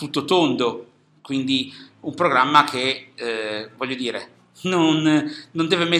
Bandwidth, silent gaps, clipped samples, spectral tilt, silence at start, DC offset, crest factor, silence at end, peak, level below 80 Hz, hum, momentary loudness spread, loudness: 12.5 kHz; none; under 0.1%; -4.5 dB/octave; 0 s; under 0.1%; 22 dB; 0 s; 0 dBFS; -70 dBFS; none; 14 LU; -21 LUFS